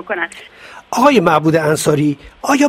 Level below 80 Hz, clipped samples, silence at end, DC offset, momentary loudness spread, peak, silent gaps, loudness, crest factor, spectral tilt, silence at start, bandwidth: -50 dBFS; under 0.1%; 0 s; under 0.1%; 13 LU; 0 dBFS; none; -14 LUFS; 14 dB; -5 dB/octave; 0.05 s; 16 kHz